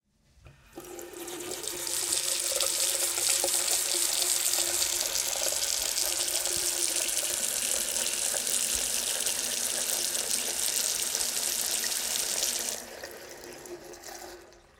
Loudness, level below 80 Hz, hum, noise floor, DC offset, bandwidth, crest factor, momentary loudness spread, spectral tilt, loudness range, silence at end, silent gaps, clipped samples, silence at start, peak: -26 LUFS; -62 dBFS; none; -57 dBFS; under 0.1%; 19 kHz; 22 dB; 18 LU; 1 dB/octave; 4 LU; 0.2 s; none; under 0.1%; 0.45 s; -8 dBFS